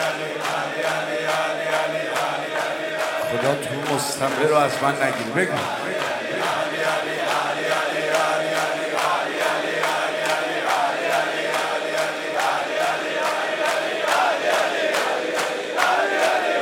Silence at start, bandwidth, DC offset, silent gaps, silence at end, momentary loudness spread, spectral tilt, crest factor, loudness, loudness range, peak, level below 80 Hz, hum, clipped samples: 0 s; 16.5 kHz; under 0.1%; none; 0 s; 5 LU; -3 dB/octave; 20 dB; -22 LUFS; 2 LU; -2 dBFS; -72 dBFS; none; under 0.1%